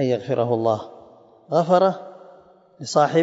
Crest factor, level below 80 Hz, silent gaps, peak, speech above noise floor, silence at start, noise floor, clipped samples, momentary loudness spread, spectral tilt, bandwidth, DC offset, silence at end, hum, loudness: 18 dB; -70 dBFS; none; -4 dBFS; 30 dB; 0 s; -50 dBFS; under 0.1%; 18 LU; -6 dB/octave; 8 kHz; under 0.1%; 0 s; none; -21 LUFS